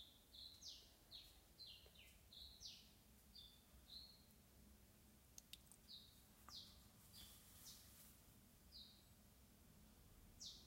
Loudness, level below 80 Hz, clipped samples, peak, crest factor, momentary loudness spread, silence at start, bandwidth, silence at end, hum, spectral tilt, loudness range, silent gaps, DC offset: -62 LUFS; -74 dBFS; under 0.1%; -38 dBFS; 26 dB; 11 LU; 0 s; 16 kHz; 0 s; none; -2 dB/octave; 3 LU; none; under 0.1%